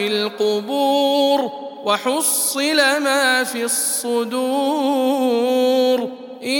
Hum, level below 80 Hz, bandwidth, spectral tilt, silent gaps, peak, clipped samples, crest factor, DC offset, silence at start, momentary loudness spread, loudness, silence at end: none; -82 dBFS; 19 kHz; -1.5 dB/octave; none; -2 dBFS; under 0.1%; 16 dB; under 0.1%; 0 s; 5 LU; -18 LUFS; 0 s